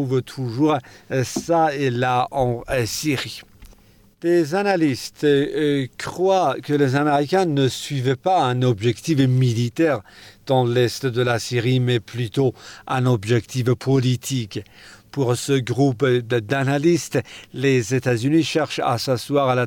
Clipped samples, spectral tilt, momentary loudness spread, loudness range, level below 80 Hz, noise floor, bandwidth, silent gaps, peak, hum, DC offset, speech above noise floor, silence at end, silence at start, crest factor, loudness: under 0.1%; -6 dB/octave; 7 LU; 3 LU; -54 dBFS; -52 dBFS; 17.5 kHz; none; -6 dBFS; none; under 0.1%; 32 dB; 0 s; 0 s; 14 dB; -21 LUFS